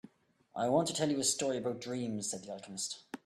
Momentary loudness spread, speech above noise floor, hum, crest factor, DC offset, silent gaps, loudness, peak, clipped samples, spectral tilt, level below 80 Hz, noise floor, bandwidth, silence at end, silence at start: 10 LU; 33 dB; none; 18 dB; under 0.1%; none; -34 LUFS; -16 dBFS; under 0.1%; -3.5 dB/octave; -76 dBFS; -68 dBFS; 14 kHz; 0.1 s; 0.55 s